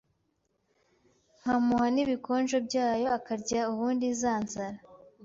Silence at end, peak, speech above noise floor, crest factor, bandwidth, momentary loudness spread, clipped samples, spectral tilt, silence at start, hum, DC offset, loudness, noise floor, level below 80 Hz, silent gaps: 0.3 s; -16 dBFS; 47 dB; 14 dB; 7.8 kHz; 10 LU; under 0.1%; -4.5 dB/octave; 1.45 s; none; under 0.1%; -29 LUFS; -76 dBFS; -64 dBFS; none